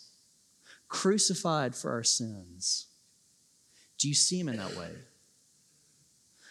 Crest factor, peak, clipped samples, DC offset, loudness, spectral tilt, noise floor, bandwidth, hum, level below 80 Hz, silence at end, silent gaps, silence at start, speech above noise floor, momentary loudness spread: 22 dB; -12 dBFS; under 0.1%; under 0.1%; -29 LUFS; -2.5 dB/octave; -66 dBFS; 14 kHz; none; -80 dBFS; 0 s; none; 0 s; 35 dB; 16 LU